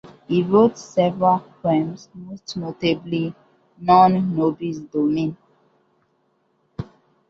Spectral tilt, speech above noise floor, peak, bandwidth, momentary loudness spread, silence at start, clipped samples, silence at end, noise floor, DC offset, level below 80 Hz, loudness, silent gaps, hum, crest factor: -7 dB/octave; 46 dB; -4 dBFS; 7.4 kHz; 20 LU; 0.05 s; under 0.1%; 0.45 s; -66 dBFS; under 0.1%; -58 dBFS; -20 LUFS; none; none; 18 dB